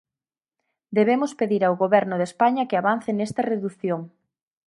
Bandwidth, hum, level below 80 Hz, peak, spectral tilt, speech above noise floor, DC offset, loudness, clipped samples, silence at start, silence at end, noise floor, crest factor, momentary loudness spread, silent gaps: 11.5 kHz; none; -72 dBFS; -4 dBFS; -6.5 dB/octave; over 68 dB; under 0.1%; -23 LUFS; under 0.1%; 0.9 s; 0.6 s; under -90 dBFS; 20 dB; 7 LU; none